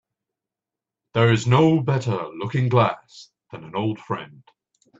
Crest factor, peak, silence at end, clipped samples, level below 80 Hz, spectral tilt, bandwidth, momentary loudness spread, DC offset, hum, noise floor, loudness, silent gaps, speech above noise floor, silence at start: 20 dB; -4 dBFS; 0.7 s; under 0.1%; -60 dBFS; -7 dB/octave; 7.8 kHz; 15 LU; under 0.1%; none; -88 dBFS; -21 LUFS; none; 67 dB; 1.15 s